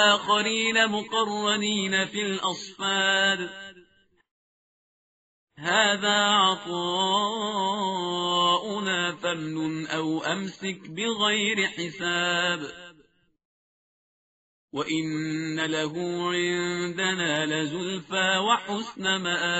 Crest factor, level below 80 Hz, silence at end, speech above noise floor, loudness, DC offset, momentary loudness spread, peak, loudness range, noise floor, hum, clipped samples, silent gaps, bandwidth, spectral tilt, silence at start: 22 dB; -70 dBFS; 0 s; 36 dB; -25 LUFS; under 0.1%; 9 LU; -6 dBFS; 7 LU; -62 dBFS; none; under 0.1%; 4.31-5.47 s, 13.45-14.68 s; 8 kHz; -1 dB/octave; 0 s